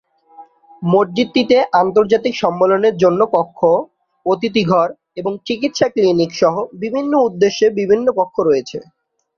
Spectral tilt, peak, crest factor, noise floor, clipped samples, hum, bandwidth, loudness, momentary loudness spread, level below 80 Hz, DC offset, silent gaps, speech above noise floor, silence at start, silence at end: -6 dB/octave; -2 dBFS; 14 dB; -43 dBFS; under 0.1%; none; 7 kHz; -16 LUFS; 9 LU; -58 dBFS; under 0.1%; none; 28 dB; 0.4 s; 0.55 s